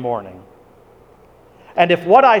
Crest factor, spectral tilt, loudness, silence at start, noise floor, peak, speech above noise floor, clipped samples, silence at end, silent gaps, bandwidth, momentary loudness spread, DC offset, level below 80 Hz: 18 dB; -6.5 dB/octave; -15 LUFS; 0 s; -48 dBFS; 0 dBFS; 34 dB; under 0.1%; 0 s; none; 9.4 kHz; 17 LU; under 0.1%; -58 dBFS